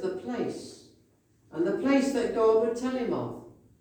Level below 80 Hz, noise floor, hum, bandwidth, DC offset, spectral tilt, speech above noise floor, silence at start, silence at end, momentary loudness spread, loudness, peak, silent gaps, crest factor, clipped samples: -64 dBFS; -64 dBFS; none; 19 kHz; under 0.1%; -5.5 dB/octave; 38 dB; 0 s; 0.3 s; 18 LU; -28 LUFS; -12 dBFS; none; 16 dB; under 0.1%